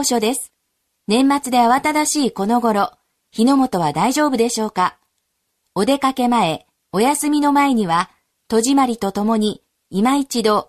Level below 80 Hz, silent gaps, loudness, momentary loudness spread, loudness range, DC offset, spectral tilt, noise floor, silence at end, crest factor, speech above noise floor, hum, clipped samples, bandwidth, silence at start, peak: -58 dBFS; none; -18 LUFS; 10 LU; 2 LU; under 0.1%; -4 dB/octave; -71 dBFS; 0.05 s; 14 dB; 55 dB; none; under 0.1%; 13.5 kHz; 0 s; -4 dBFS